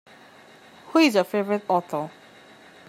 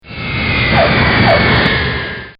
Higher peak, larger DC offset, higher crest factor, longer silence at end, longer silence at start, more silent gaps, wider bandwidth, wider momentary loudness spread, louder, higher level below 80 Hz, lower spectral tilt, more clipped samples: second, -6 dBFS vs 0 dBFS; neither; first, 20 dB vs 12 dB; first, 0.8 s vs 0.1 s; first, 0.9 s vs 0.05 s; neither; first, 16 kHz vs 5.4 kHz; first, 13 LU vs 8 LU; second, -23 LUFS vs -12 LUFS; second, -78 dBFS vs -26 dBFS; second, -5 dB/octave vs -8 dB/octave; neither